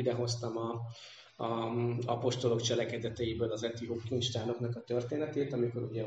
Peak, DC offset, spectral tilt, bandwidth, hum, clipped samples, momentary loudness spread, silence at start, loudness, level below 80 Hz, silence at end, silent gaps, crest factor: -18 dBFS; under 0.1%; -5.5 dB/octave; 9.2 kHz; none; under 0.1%; 8 LU; 0 s; -35 LUFS; -68 dBFS; 0 s; none; 18 dB